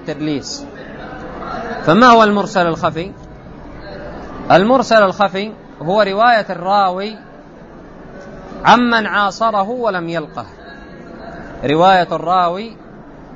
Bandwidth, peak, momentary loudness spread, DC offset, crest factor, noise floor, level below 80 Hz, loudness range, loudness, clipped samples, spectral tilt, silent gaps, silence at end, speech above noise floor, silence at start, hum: 7.8 kHz; 0 dBFS; 23 LU; under 0.1%; 16 dB; -37 dBFS; -42 dBFS; 3 LU; -14 LUFS; under 0.1%; -5.5 dB/octave; none; 0 s; 23 dB; 0 s; none